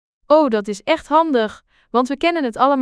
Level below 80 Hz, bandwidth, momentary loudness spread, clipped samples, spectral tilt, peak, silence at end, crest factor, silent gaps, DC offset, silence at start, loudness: -54 dBFS; 11 kHz; 7 LU; under 0.1%; -5 dB/octave; -2 dBFS; 0 s; 16 dB; none; under 0.1%; 0.3 s; -18 LUFS